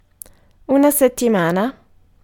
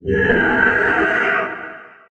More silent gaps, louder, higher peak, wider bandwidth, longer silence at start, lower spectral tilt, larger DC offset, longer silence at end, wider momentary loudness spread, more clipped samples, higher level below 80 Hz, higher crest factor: neither; about the same, -16 LUFS vs -16 LUFS; about the same, -2 dBFS vs -2 dBFS; first, 18 kHz vs 8.6 kHz; first, 0.7 s vs 0.05 s; second, -5 dB/octave vs -6.5 dB/octave; neither; first, 0.5 s vs 0.2 s; second, 7 LU vs 14 LU; neither; second, -52 dBFS vs -40 dBFS; about the same, 16 dB vs 16 dB